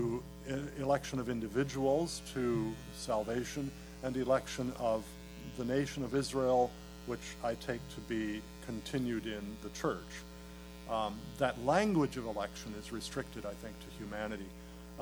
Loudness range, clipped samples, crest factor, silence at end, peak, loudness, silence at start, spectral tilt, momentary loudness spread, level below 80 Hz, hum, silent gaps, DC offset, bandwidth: 4 LU; under 0.1%; 22 dB; 0 s; -14 dBFS; -37 LUFS; 0 s; -5.5 dB/octave; 15 LU; -54 dBFS; none; none; under 0.1%; 19.5 kHz